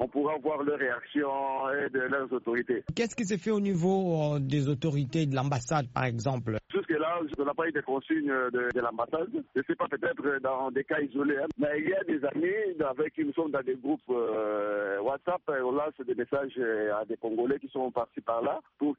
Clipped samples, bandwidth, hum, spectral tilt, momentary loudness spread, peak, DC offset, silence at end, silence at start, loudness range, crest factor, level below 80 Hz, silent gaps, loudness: under 0.1%; 8 kHz; none; -6 dB/octave; 4 LU; -14 dBFS; under 0.1%; 0.05 s; 0 s; 2 LU; 16 dB; -64 dBFS; none; -30 LUFS